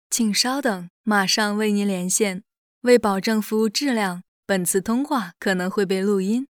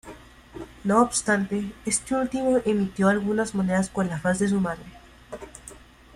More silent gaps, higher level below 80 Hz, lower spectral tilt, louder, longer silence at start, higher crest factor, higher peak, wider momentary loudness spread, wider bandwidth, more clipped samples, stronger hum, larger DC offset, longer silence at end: first, 0.90-1.04 s, 2.58-2.81 s, 4.28-4.43 s vs none; second, -64 dBFS vs -52 dBFS; second, -3.5 dB/octave vs -5 dB/octave; first, -21 LUFS vs -24 LUFS; about the same, 0.1 s vs 0.05 s; about the same, 18 dB vs 16 dB; first, -4 dBFS vs -8 dBFS; second, 7 LU vs 20 LU; first, 19.5 kHz vs 13 kHz; neither; neither; neither; second, 0.15 s vs 0.4 s